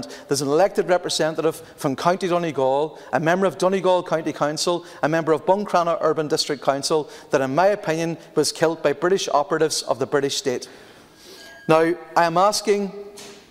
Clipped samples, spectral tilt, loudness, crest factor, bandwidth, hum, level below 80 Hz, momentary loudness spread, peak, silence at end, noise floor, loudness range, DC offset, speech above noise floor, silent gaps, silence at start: under 0.1%; -4 dB/octave; -21 LUFS; 20 dB; 16 kHz; none; -62 dBFS; 7 LU; -2 dBFS; 0.1 s; -46 dBFS; 1 LU; under 0.1%; 25 dB; none; 0 s